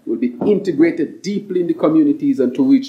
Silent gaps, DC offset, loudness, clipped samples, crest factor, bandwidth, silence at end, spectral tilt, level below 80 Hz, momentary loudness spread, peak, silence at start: none; under 0.1%; -17 LUFS; under 0.1%; 14 dB; 8 kHz; 0 s; -7.5 dB/octave; -70 dBFS; 8 LU; -2 dBFS; 0.05 s